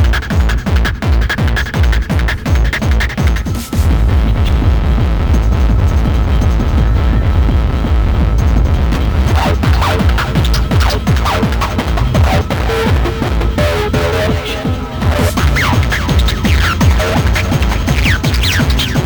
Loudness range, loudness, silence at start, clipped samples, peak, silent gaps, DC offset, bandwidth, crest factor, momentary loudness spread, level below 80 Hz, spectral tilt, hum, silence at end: 2 LU; -13 LUFS; 0 s; under 0.1%; 0 dBFS; none; under 0.1%; over 20 kHz; 12 dB; 3 LU; -14 dBFS; -6 dB/octave; none; 0 s